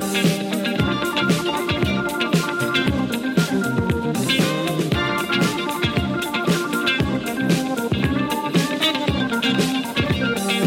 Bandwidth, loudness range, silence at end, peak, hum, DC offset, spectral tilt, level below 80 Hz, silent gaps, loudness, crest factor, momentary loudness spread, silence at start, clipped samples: 17 kHz; 0 LU; 0 s; -4 dBFS; none; under 0.1%; -5 dB/octave; -42 dBFS; none; -20 LUFS; 18 dB; 3 LU; 0 s; under 0.1%